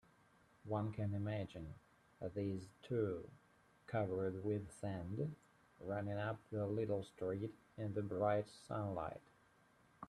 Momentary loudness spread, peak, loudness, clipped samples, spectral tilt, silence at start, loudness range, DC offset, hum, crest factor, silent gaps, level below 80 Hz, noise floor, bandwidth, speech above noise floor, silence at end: 11 LU; -24 dBFS; -44 LUFS; under 0.1%; -8 dB/octave; 0.65 s; 2 LU; under 0.1%; none; 20 dB; none; -72 dBFS; -72 dBFS; 11.5 kHz; 29 dB; 0 s